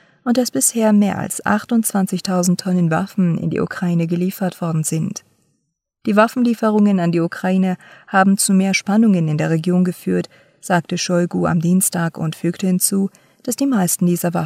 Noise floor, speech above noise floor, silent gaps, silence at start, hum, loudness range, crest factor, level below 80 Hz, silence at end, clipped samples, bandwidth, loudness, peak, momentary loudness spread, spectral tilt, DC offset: -72 dBFS; 55 dB; none; 0.25 s; none; 4 LU; 16 dB; -62 dBFS; 0 s; under 0.1%; 16 kHz; -17 LUFS; -2 dBFS; 7 LU; -5.5 dB/octave; under 0.1%